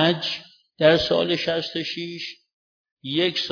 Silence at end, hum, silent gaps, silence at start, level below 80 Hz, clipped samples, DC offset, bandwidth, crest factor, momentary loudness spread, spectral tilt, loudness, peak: 0 s; none; 2.53-2.85 s, 2.92-2.97 s; 0 s; -56 dBFS; under 0.1%; under 0.1%; 5.4 kHz; 20 dB; 15 LU; -5.5 dB/octave; -23 LUFS; -4 dBFS